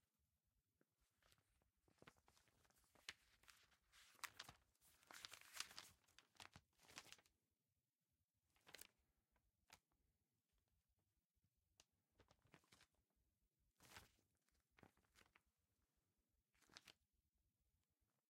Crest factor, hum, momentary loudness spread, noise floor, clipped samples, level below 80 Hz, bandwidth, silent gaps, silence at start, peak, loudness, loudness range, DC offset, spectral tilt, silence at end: 38 dB; none; 12 LU; under -90 dBFS; under 0.1%; under -90 dBFS; 16 kHz; 8.24-8.28 s, 11.25-11.30 s; 0.2 s; -32 dBFS; -61 LUFS; 9 LU; under 0.1%; -0.5 dB/octave; 0.25 s